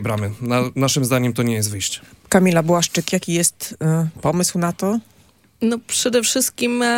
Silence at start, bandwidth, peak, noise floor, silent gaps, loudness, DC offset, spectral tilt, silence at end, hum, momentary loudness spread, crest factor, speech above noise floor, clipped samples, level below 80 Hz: 0 s; 17 kHz; 0 dBFS; -54 dBFS; none; -19 LUFS; under 0.1%; -4 dB/octave; 0 s; none; 7 LU; 18 dB; 35 dB; under 0.1%; -54 dBFS